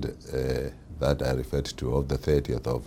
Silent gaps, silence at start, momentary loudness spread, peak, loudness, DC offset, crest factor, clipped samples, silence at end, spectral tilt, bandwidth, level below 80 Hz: none; 0 s; 6 LU; -8 dBFS; -29 LUFS; under 0.1%; 20 dB; under 0.1%; 0 s; -6.5 dB/octave; 16.5 kHz; -36 dBFS